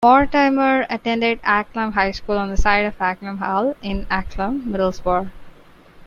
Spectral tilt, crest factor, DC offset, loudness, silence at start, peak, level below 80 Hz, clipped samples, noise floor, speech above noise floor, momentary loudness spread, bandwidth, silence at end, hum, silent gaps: -6 dB/octave; 16 dB; under 0.1%; -20 LUFS; 0 s; -2 dBFS; -32 dBFS; under 0.1%; -46 dBFS; 27 dB; 8 LU; 7.4 kHz; 0 s; none; none